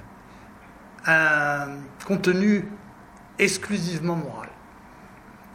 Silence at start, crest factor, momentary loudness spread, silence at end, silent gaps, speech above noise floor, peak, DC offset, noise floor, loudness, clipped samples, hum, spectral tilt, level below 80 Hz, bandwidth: 0 s; 22 dB; 19 LU; 0 s; none; 24 dB; -4 dBFS; under 0.1%; -47 dBFS; -23 LUFS; under 0.1%; none; -5 dB/octave; -58 dBFS; 16 kHz